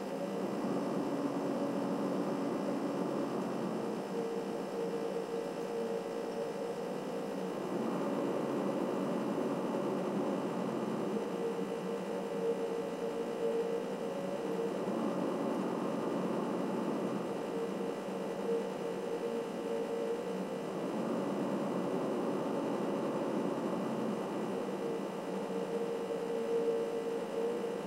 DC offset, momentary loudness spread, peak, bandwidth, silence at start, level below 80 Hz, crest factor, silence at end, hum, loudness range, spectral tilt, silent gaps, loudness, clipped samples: under 0.1%; 3 LU; -22 dBFS; 16 kHz; 0 s; -82 dBFS; 14 dB; 0 s; none; 2 LU; -6.5 dB/octave; none; -36 LUFS; under 0.1%